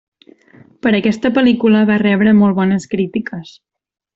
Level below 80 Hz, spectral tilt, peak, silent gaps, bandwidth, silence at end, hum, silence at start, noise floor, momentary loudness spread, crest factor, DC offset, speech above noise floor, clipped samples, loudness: -54 dBFS; -7 dB/octave; -2 dBFS; none; 7.8 kHz; 0.65 s; none; 0.85 s; -46 dBFS; 10 LU; 12 dB; under 0.1%; 33 dB; under 0.1%; -14 LUFS